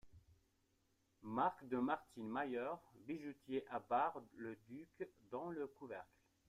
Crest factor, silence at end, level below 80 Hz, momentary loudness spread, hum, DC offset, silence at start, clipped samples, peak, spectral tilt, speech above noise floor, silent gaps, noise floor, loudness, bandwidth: 18 dB; 0.45 s; -80 dBFS; 13 LU; none; under 0.1%; 0.05 s; under 0.1%; -28 dBFS; -7 dB/octave; 36 dB; none; -81 dBFS; -45 LUFS; 14.5 kHz